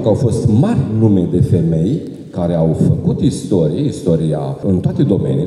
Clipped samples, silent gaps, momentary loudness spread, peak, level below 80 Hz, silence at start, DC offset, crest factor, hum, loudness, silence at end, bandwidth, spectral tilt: under 0.1%; none; 5 LU; -2 dBFS; -40 dBFS; 0 s; under 0.1%; 12 dB; none; -15 LUFS; 0 s; 11.5 kHz; -9 dB/octave